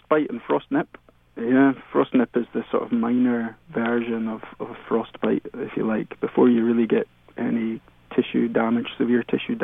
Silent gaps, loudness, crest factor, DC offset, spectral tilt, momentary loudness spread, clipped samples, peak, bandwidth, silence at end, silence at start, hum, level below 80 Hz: none; -23 LUFS; 16 dB; under 0.1%; -9.5 dB/octave; 11 LU; under 0.1%; -6 dBFS; 3.8 kHz; 0 s; 0.1 s; none; -60 dBFS